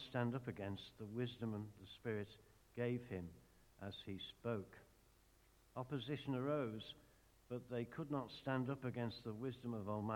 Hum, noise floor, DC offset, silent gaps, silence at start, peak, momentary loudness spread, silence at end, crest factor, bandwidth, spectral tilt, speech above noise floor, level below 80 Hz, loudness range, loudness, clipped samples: none; -72 dBFS; under 0.1%; none; 0 s; -26 dBFS; 13 LU; 0 s; 20 dB; 17.5 kHz; -7.5 dB/octave; 26 dB; -74 dBFS; 4 LU; -47 LUFS; under 0.1%